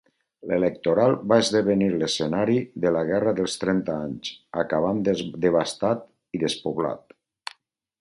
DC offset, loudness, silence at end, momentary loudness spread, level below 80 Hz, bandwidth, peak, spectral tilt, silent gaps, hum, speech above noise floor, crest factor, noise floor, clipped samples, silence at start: under 0.1%; -24 LUFS; 1.05 s; 13 LU; -58 dBFS; 11.5 kHz; -4 dBFS; -5.5 dB/octave; none; none; 34 dB; 20 dB; -58 dBFS; under 0.1%; 0.45 s